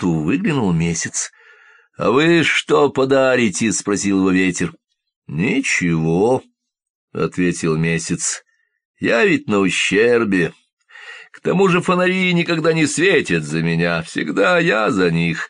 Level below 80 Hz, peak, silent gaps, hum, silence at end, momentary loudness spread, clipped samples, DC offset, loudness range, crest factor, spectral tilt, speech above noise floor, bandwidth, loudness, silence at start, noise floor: -50 dBFS; -4 dBFS; 5.16-5.22 s, 6.90-7.08 s, 8.85-8.94 s, 10.73-10.77 s; none; 0 s; 9 LU; under 0.1%; under 0.1%; 4 LU; 14 dB; -4.5 dB/octave; 33 dB; 10 kHz; -17 LUFS; 0 s; -49 dBFS